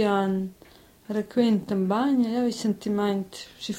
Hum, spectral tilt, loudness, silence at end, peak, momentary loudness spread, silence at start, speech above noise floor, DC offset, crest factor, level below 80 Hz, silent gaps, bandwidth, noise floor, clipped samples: none; -6.5 dB/octave; -25 LUFS; 0 s; -10 dBFS; 9 LU; 0 s; 28 dB; under 0.1%; 16 dB; -62 dBFS; none; 16 kHz; -53 dBFS; under 0.1%